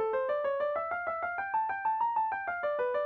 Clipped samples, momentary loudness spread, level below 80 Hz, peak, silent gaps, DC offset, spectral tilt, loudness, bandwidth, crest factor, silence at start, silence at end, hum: under 0.1%; 4 LU; -72 dBFS; -22 dBFS; none; under 0.1%; -5.5 dB/octave; -32 LUFS; 4.7 kHz; 10 dB; 0 s; 0 s; none